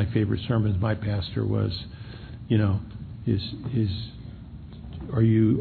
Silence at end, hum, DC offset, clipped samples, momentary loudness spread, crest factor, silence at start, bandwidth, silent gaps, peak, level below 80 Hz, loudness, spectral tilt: 0 s; none; under 0.1%; under 0.1%; 18 LU; 16 dB; 0 s; 4.6 kHz; none; -10 dBFS; -44 dBFS; -26 LUFS; -11 dB/octave